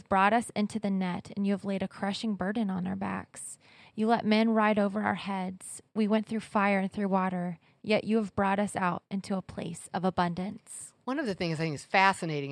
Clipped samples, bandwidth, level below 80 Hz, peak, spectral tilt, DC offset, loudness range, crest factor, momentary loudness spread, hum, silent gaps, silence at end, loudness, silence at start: under 0.1%; 12.5 kHz; -66 dBFS; -8 dBFS; -5.5 dB/octave; under 0.1%; 4 LU; 22 dB; 13 LU; none; none; 0 s; -30 LUFS; 0.1 s